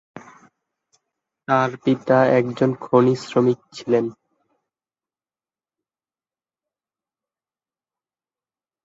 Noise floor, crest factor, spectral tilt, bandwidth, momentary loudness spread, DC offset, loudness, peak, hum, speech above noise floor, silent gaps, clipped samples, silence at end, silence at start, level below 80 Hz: under -90 dBFS; 22 dB; -7.5 dB/octave; 7.8 kHz; 7 LU; under 0.1%; -20 LUFS; -2 dBFS; none; over 71 dB; none; under 0.1%; 4.7 s; 0.15 s; -66 dBFS